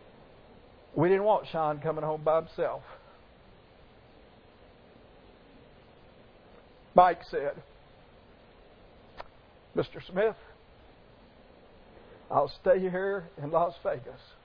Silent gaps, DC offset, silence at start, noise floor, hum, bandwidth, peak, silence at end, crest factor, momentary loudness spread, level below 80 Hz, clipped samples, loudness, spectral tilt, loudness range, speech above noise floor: none; under 0.1%; 0.95 s; -56 dBFS; none; 5.4 kHz; -6 dBFS; 0.3 s; 26 dB; 22 LU; -60 dBFS; under 0.1%; -29 LUFS; -5 dB/octave; 7 LU; 28 dB